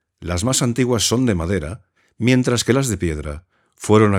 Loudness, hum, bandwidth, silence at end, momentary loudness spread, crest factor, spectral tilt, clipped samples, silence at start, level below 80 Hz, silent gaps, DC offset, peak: -19 LUFS; none; 16.5 kHz; 0 s; 15 LU; 18 dB; -5 dB/octave; under 0.1%; 0.2 s; -38 dBFS; none; under 0.1%; 0 dBFS